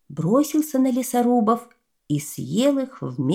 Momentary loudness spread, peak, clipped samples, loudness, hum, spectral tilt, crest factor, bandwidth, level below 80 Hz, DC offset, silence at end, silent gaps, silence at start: 8 LU; -6 dBFS; under 0.1%; -22 LUFS; none; -6 dB/octave; 16 dB; 17.5 kHz; -68 dBFS; under 0.1%; 0 s; none; 0.1 s